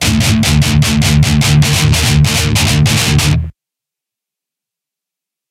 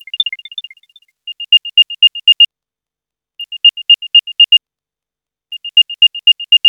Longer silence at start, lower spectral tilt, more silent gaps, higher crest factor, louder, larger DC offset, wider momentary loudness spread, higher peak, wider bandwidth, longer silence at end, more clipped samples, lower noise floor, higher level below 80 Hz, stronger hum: second, 0 s vs 0.15 s; first, -4 dB/octave vs 8 dB/octave; neither; about the same, 12 dB vs 14 dB; about the same, -10 LUFS vs -8 LUFS; neither; second, 2 LU vs 19 LU; about the same, 0 dBFS vs 0 dBFS; first, 16 kHz vs 6 kHz; first, 2 s vs 0 s; neither; about the same, -84 dBFS vs -87 dBFS; first, -22 dBFS vs under -90 dBFS; neither